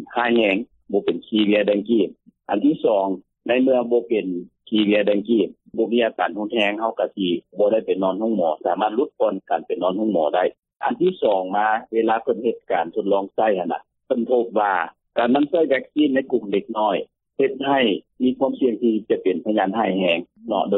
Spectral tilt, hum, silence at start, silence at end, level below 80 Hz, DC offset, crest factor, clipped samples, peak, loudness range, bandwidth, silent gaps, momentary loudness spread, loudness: -8 dB/octave; none; 0 s; 0 s; -68 dBFS; under 0.1%; 16 dB; under 0.1%; -6 dBFS; 1 LU; 4.1 kHz; 10.59-10.63 s; 7 LU; -21 LUFS